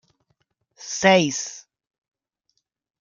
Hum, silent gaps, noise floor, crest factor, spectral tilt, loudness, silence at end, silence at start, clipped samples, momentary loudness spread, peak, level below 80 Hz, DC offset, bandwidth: none; none; -74 dBFS; 22 dB; -3.5 dB/octave; -20 LUFS; 1.4 s; 0.8 s; under 0.1%; 18 LU; -4 dBFS; -68 dBFS; under 0.1%; 7.6 kHz